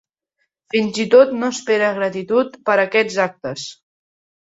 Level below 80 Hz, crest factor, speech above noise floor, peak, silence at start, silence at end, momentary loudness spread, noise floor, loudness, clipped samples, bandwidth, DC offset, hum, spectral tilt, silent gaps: -64 dBFS; 18 dB; 55 dB; -2 dBFS; 0.75 s; 0.7 s; 14 LU; -72 dBFS; -17 LUFS; under 0.1%; 8 kHz; under 0.1%; none; -4 dB/octave; none